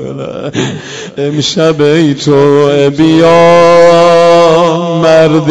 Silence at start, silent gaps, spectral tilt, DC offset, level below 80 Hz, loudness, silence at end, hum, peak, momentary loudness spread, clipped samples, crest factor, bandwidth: 0 s; none; -5.5 dB/octave; under 0.1%; -44 dBFS; -7 LUFS; 0 s; none; 0 dBFS; 13 LU; 6%; 6 dB; 11 kHz